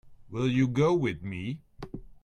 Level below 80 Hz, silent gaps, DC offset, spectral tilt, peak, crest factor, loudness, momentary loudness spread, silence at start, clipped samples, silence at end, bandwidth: -54 dBFS; none; under 0.1%; -7.5 dB/octave; -12 dBFS; 16 dB; -28 LUFS; 19 LU; 0.05 s; under 0.1%; 0.1 s; 10 kHz